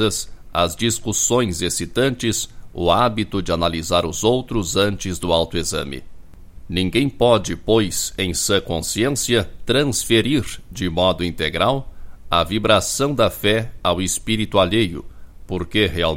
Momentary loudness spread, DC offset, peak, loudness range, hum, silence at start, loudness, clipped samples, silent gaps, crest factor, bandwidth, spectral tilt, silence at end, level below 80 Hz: 8 LU; under 0.1%; 0 dBFS; 2 LU; none; 0 s; -19 LUFS; under 0.1%; none; 20 dB; 16.5 kHz; -4 dB/octave; 0 s; -38 dBFS